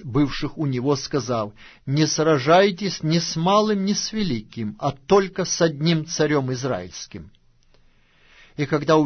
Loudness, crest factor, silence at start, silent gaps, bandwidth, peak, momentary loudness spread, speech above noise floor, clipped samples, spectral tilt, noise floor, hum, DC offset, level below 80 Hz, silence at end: -22 LUFS; 18 dB; 0 s; none; 6.6 kHz; -4 dBFS; 12 LU; 34 dB; under 0.1%; -5 dB/octave; -56 dBFS; none; under 0.1%; -48 dBFS; 0 s